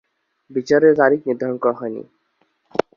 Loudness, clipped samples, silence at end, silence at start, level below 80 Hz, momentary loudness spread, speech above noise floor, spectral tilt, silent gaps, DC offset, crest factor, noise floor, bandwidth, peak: -18 LUFS; under 0.1%; 0.15 s; 0.5 s; -64 dBFS; 14 LU; 48 dB; -6.5 dB/octave; none; under 0.1%; 18 dB; -66 dBFS; 7.2 kHz; -2 dBFS